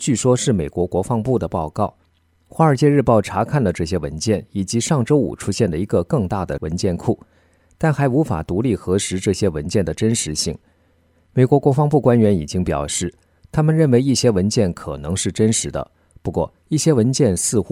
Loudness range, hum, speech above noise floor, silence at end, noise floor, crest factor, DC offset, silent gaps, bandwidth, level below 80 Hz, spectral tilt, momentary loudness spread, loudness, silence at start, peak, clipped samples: 3 LU; none; 40 dB; 0 s; -58 dBFS; 16 dB; under 0.1%; none; 15.5 kHz; -42 dBFS; -5.5 dB/octave; 10 LU; -19 LUFS; 0 s; -2 dBFS; under 0.1%